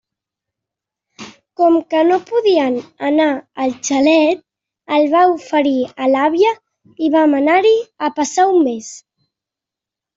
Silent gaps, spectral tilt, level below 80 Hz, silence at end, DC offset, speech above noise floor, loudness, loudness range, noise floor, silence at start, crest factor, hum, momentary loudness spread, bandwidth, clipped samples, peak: none; -3 dB/octave; -64 dBFS; 1.2 s; under 0.1%; 72 dB; -15 LUFS; 2 LU; -86 dBFS; 1.2 s; 14 dB; none; 9 LU; 7.8 kHz; under 0.1%; -2 dBFS